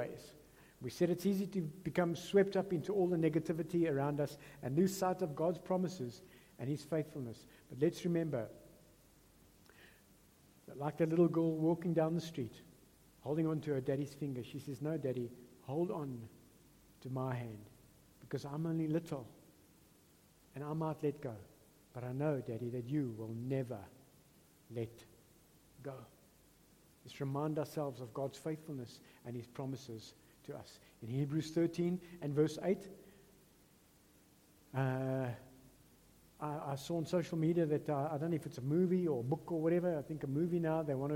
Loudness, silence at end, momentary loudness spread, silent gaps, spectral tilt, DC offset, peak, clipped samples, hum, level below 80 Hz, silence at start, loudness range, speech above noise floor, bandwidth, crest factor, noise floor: -38 LUFS; 0 s; 17 LU; none; -7.5 dB/octave; under 0.1%; -18 dBFS; under 0.1%; none; -72 dBFS; 0 s; 9 LU; 30 dB; 16.5 kHz; 20 dB; -67 dBFS